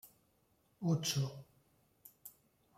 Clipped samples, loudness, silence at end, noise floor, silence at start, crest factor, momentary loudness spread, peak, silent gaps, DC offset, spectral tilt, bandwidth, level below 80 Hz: under 0.1%; -37 LUFS; 0.45 s; -75 dBFS; 0.05 s; 18 dB; 22 LU; -24 dBFS; none; under 0.1%; -5 dB/octave; 16.5 kHz; -76 dBFS